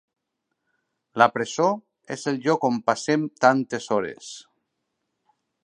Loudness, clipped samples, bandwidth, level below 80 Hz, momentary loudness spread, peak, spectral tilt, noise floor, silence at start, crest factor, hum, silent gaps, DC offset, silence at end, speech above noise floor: -23 LUFS; under 0.1%; 11 kHz; -72 dBFS; 16 LU; -2 dBFS; -5 dB/octave; -80 dBFS; 1.15 s; 24 dB; none; none; under 0.1%; 1.25 s; 57 dB